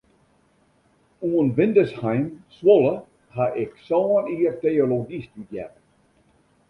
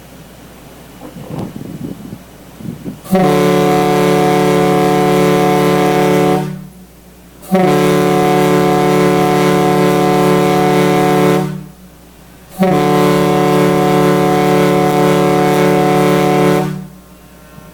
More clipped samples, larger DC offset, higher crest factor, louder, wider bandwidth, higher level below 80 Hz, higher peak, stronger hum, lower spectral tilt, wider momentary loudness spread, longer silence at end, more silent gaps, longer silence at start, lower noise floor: neither; neither; first, 20 dB vs 12 dB; second, -21 LUFS vs -11 LUFS; second, 5.4 kHz vs 19 kHz; second, -62 dBFS vs -44 dBFS; second, -4 dBFS vs 0 dBFS; neither; first, -9.5 dB/octave vs -6 dB/octave; first, 18 LU vs 15 LU; first, 1 s vs 0.05 s; neither; first, 1.2 s vs 0.2 s; first, -62 dBFS vs -39 dBFS